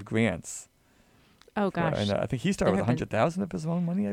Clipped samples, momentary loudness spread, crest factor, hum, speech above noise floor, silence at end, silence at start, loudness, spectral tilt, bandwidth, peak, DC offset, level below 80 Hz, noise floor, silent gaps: under 0.1%; 10 LU; 18 dB; none; 35 dB; 0 s; 0 s; -28 LUFS; -6 dB/octave; 14 kHz; -10 dBFS; under 0.1%; -52 dBFS; -62 dBFS; none